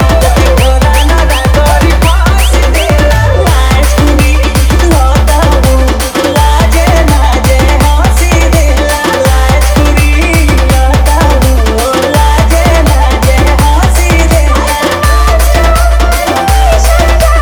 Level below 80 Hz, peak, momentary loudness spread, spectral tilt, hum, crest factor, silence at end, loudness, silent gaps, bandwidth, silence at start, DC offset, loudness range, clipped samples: -8 dBFS; 0 dBFS; 2 LU; -5 dB/octave; none; 6 dB; 0 s; -8 LUFS; none; 20 kHz; 0 s; under 0.1%; 0 LU; 0.6%